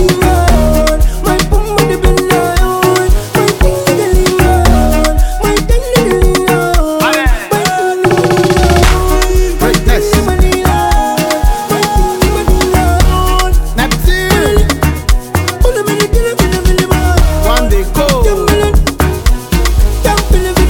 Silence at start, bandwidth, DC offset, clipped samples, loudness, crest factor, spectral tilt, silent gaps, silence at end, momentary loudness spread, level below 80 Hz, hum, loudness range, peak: 0 s; 17.5 kHz; under 0.1%; under 0.1%; -11 LUFS; 8 dB; -5 dB/octave; none; 0 s; 3 LU; -12 dBFS; none; 1 LU; 0 dBFS